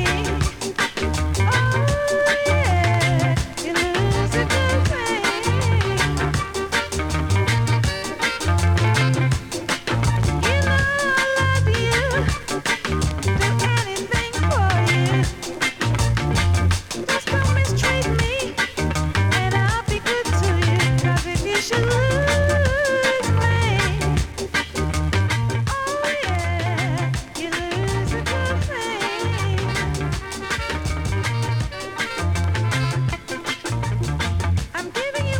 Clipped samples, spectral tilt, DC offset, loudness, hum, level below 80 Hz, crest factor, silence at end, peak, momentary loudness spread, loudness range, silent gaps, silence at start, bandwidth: under 0.1%; -5 dB/octave; under 0.1%; -21 LUFS; none; -32 dBFS; 14 dB; 0 s; -6 dBFS; 6 LU; 4 LU; none; 0 s; 17.5 kHz